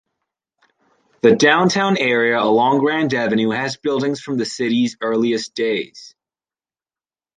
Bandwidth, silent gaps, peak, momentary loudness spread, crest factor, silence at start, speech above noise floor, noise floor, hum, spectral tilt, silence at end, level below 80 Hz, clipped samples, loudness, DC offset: 9.6 kHz; none; 0 dBFS; 8 LU; 18 dB; 1.25 s; over 73 dB; under -90 dBFS; none; -4.5 dB/octave; 1.3 s; -64 dBFS; under 0.1%; -17 LUFS; under 0.1%